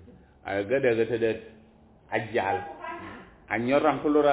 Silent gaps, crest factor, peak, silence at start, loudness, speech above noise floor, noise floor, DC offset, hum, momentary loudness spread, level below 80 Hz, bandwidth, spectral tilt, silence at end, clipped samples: none; 18 dB; -10 dBFS; 0.1 s; -27 LUFS; 31 dB; -56 dBFS; under 0.1%; none; 16 LU; -58 dBFS; 4 kHz; -10 dB/octave; 0 s; under 0.1%